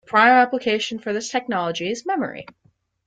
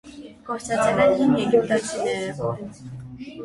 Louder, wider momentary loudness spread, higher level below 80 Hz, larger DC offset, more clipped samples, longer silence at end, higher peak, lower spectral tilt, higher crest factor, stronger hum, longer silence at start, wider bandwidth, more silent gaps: about the same, -20 LUFS vs -22 LUFS; second, 12 LU vs 20 LU; second, -66 dBFS vs -54 dBFS; neither; neither; first, 0.65 s vs 0 s; first, -2 dBFS vs -6 dBFS; second, -3.5 dB/octave vs -5.5 dB/octave; about the same, 18 dB vs 18 dB; neither; about the same, 0.1 s vs 0.05 s; second, 9.2 kHz vs 11.5 kHz; neither